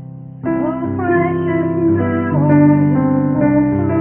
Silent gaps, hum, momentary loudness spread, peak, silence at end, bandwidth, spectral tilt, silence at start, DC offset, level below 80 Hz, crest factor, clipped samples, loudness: none; none; 8 LU; 0 dBFS; 0 s; 3.3 kHz; -13.5 dB/octave; 0 s; under 0.1%; -44 dBFS; 14 dB; under 0.1%; -15 LUFS